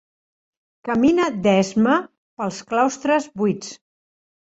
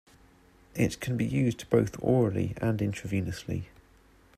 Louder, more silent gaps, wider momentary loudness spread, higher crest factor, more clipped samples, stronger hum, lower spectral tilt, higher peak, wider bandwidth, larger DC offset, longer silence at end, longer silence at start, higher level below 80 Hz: first, -20 LUFS vs -29 LUFS; first, 2.18-2.37 s vs none; about the same, 12 LU vs 11 LU; about the same, 16 dB vs 20 dB; neither; neither; second, -5.5 dB/octave vs -7 dB/octave; first, -4 dBFS vs -10 dBFS; second, 8 kHz vs 15 kHz; neither; about the same, 0.75 s vs 0.75 s; about the same, 0.85 s vs 0.75 s; about the same, -58 dBFS vs -54 dBFS